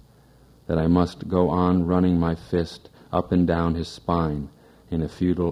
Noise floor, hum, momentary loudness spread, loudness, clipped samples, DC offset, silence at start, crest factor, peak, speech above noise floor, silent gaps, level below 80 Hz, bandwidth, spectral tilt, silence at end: -53 dBFS; none; 11 LU; -23 LUFS; under 0.1%; under 0.1%; 0.7 s; 18 dB; -4 dBFS; 31 dB; none; -44 dBFS; 10 kHz; -8.5 dB/octave; 0 s